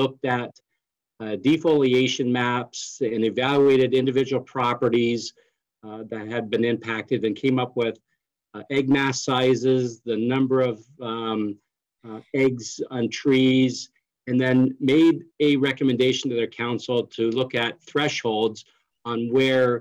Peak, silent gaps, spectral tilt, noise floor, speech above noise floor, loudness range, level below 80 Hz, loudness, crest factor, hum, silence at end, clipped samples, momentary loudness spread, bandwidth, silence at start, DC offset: -12 dBFS; none; -5.5 dB/octave; -81 dBFS; 59 dB; 4 LU; -66 dBFS; -23 LUFS; 10 dB; none; 0 s; under 0.1%; 14 LU; 9 kHz; 0 s; under 0.1%